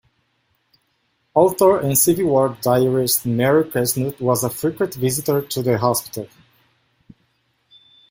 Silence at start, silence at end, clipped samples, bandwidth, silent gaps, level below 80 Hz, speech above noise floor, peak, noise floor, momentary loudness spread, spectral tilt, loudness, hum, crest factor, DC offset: 1.35 s; 1.85 s; under 0.1%; 16.5 kHz; none; -56 dBFS; 49 dB; -2 dBFS; -67 dBFS; 7 LU; -5 dB/octave; -18 LUFS; none; 18 dB; under 0.1%